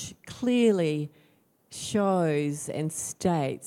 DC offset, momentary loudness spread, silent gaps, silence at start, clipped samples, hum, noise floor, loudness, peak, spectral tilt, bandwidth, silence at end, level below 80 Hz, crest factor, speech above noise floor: under 0.1%; 14 LU; none; 0 s; under 0.1%; none; -64 dBFS; -27 LUFS; -12 dBFS; -5.5 dB/octave; 16 kHz; 0 s; -64 dBFS; 16 dB; 38 dB